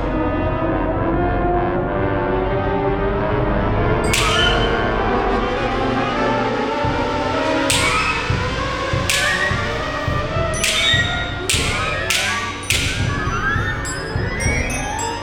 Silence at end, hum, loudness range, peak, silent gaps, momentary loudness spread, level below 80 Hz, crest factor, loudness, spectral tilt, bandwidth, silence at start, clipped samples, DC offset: 0 s; none; 2 LU; -2 dBFS; none; 6 LU; -28 dBFS; 16 dB; -19 LUFS; -4 dB/octave; over 20 kHz; 0 s; under 0.1%; under 0.1%